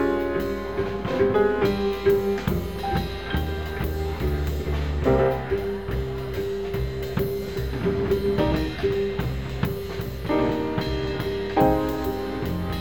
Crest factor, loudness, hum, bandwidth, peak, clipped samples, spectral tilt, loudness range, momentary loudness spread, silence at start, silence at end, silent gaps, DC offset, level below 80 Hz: 18 dB; -25 LUFS; none; 19 kHz; -6 dBFS; under 0.1%; -7 dB/octave; 2 LU; 8 LU; 0 s; 0 s; none; 0.7%; -34 dBFS